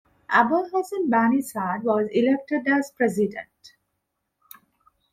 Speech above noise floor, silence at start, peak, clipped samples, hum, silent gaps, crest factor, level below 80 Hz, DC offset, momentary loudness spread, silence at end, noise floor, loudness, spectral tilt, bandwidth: 56 dB; 0.3 s; -4 dBFS; under 0.1%; none; none; 20 dB; -70 dBFS; under 0.1%; 7 LU; 1.45 s; -78 dBFS; -23 LUFS; -5.5 dB/octave; 16 kHz